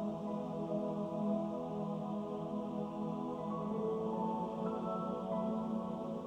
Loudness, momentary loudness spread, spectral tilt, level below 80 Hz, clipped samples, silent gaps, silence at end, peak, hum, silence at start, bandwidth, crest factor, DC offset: -39 LUFS; 3 LU; -9 dB/octave; -70 dBFS; under 0.1%; none; 0 s; -26 dBFS; none; 0 s; 8.6 kHz; 14 dB; under 0.1%